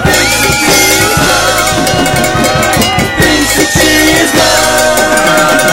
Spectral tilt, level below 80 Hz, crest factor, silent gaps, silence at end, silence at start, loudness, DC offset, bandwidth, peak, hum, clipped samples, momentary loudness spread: -2.5 dB/octave; -26 dBFS; 8 dB; none; 0 s; 0 s; -7 LUFS; 1%; 17 kHz; 0 dBFS; none; 0.2%; 3 LU